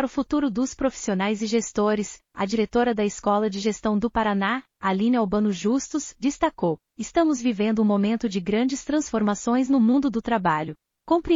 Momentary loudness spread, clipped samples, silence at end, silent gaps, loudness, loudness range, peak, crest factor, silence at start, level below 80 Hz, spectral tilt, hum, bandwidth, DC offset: 6 LU; under 0.1%; 0 s; none; -24 LUFS; 2 LU; -8 dBFS; 16 dB; 0 s; -50 dBFS; -5.5 dB/octave; none; 7.6 kHz; under 0.1%